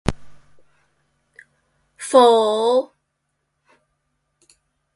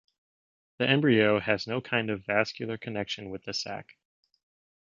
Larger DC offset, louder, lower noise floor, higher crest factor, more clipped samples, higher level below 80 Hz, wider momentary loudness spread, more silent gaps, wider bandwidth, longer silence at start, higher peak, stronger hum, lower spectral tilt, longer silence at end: neither; first, -16 LUFS vs -28 LUFS; second, -74 dBFS vs under -90 dBFS; about the same, 22 dB vs 24 dB; neither; first, -46 dBFS vs -64 dBFS; first, 20 LU vs 13 LU; neither; first, 11.5 kHz vs 7.4 kHz; second, 0.05 s vs 0.8 s; first, 0 dBFS vs -6 dBFS; neither; about the same, -4.5 dB/octave vs -5.5 dB/octave; first, 2.1 s vs 1 s